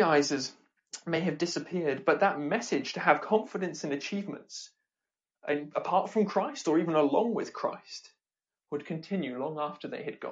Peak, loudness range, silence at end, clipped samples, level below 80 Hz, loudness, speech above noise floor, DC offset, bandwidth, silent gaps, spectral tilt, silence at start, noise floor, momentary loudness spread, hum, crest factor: -8 dBFS; 4 LU; 0 s; under 0.1%; -80 dBFS; -30 LUFS; over 60 dB; under 0.1%; 9.2 kHz; none; -5 dB/octave; 0 s; under -90 dBFS; 15 LU; none; 22 dB